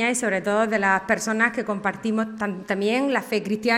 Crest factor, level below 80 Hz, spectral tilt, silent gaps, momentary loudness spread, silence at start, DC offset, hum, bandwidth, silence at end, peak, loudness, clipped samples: 16 dB; -62 dBFS; -4 dB/octave; none; 6 LU; 0 s; under 0.1%; none; 15.5 kHz; 0 s; -6 dBFS; -23 LUFS; under 0.1%